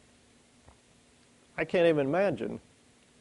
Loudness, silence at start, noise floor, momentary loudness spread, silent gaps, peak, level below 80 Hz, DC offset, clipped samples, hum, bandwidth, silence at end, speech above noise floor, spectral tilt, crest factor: -28 LUFS; 1.55 s; -62 dBFS; 17 LU; none; -14 dBFS; -66 dBFS; under 0.1%; under 0.1%; none; 11 kHz; 0.6 s; 35 dB; -7 dB/octave; 18 dB